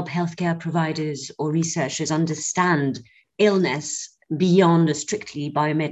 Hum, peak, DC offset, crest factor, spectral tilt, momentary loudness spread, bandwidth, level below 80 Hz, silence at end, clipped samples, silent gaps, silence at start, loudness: none; -4 dBFS; under 0.1%; 18 dB; -5 dB/octave; 11 LU; 8.4 kHz; -64 dBFS; 0 s; under 0.1%; none; 0 s; -22 LUFS